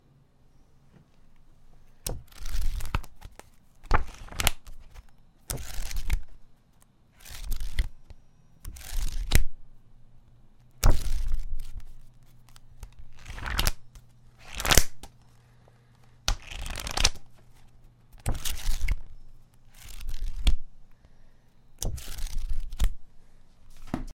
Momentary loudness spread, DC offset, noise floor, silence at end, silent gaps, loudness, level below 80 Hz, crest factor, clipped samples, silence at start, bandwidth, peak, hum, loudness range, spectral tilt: 24 LU; under 0.1%; -59 dBFS; 0.05 s; none; -32 LUFS; -32 dBFS; 28 dB; under 0.1%; 2.05 s; 16.5 kHz; 0 dBFS; none; 9 LU; -2.5 dB/octave